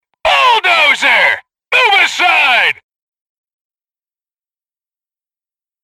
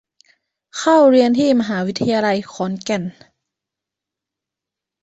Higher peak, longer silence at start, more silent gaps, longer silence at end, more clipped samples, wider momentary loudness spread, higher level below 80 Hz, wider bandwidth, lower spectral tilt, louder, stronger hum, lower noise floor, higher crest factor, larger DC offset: about the same, 0 dBFS vs -2 dBFS; second, 0.25 s vs 0.75 s; neither; first, 3.1 s vs 1.9 s; neither; second, 6 LU vs 13 LU; first, -54 dBFS vs -60 dBFS; first, 16 kHz vs 8.2 kHz; second, 0 dB/octave vs -5.5 dB/octave; first, -9 LUFS vs -16 LUFS; neither; first, under -90 dBFS vs -85 dBFS; about the same, 14 dB vs 16 dB; neither